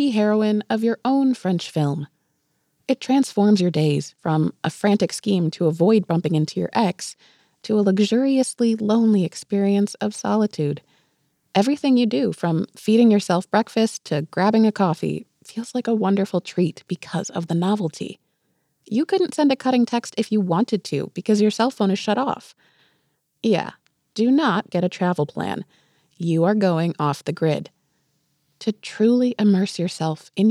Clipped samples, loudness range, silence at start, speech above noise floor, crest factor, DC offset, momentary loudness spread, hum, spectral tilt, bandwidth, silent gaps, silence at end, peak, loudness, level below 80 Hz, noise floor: under 0.1%; 4 LU; 0 s; 50 dB; 16 dB; under 0.1%; 10 LU; none; -6.5 dB/octave; 12.5 kHz; none; 0 s; -4 dBFS; -21 LUFS; -72 dBFS; -70 dBFS